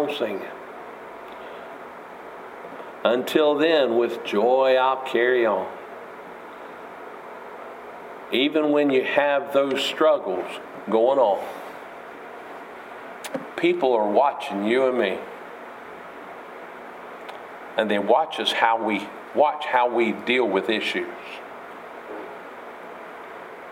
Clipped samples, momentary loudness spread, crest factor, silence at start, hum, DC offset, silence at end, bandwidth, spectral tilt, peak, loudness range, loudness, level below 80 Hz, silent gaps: under 0.1%; 19 LU; 20 dB; 0 s; none; under 0.1%; 0 s; 16 kHz; -4.5 dB/octave; -4 dBFS; 7 LU; -22 LUFS; -74 dBFS; none